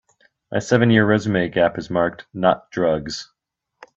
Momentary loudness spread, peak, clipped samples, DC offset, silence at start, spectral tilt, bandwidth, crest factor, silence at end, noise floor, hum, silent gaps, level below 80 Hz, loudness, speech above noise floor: 12 LU; 0 dBFS; under 0.1%; under 0.1%; 0.5 s; -6 dB/octave; 7.8 kHz; 20 dB; 0.7 s; -52 dBFS; none; none; -54 dBFS; -19 LUFS; 33 dB